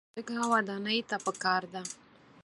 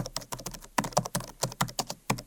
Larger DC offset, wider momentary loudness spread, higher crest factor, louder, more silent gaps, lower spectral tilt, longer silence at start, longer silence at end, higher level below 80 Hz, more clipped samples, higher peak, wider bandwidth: neither; first, 12 LU vs 8 LU; second, 20 dB vs 28 dB; about the same, -31 LUFS vs -32 LUFS; neither; about the same, -3 dB/octave vs -3.5 dB/octave; first, 0.15 s vs 0 s; first, 0.5 s vs 0 s; second, -78 dBFS vs -52 dBFS; neither; second, -12 dBFS vs -6 dBFS; second, 11.5 kHz vs 18 kHz